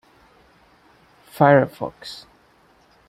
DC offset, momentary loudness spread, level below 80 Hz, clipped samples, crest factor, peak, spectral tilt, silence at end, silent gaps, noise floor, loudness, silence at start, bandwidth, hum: under 0.1%; 21 LU; -62 dBFS; under 0.1%; 22 dB; -2 dBFS; -7.5 dB/octave; 0.95 s; none; -56 dBFS; -18 LUFS; 1.4 s; 15 kHz; none